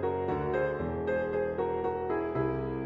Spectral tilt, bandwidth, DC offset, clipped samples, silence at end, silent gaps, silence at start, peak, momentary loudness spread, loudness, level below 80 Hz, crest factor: -9.5 dB/octave; 5.2 kHz; under 0.1%; under 0.1%; 0 s; none; 0 s; -18 dBFS; 2 LU; -31 LUFS; -50 dBFS; 14 dB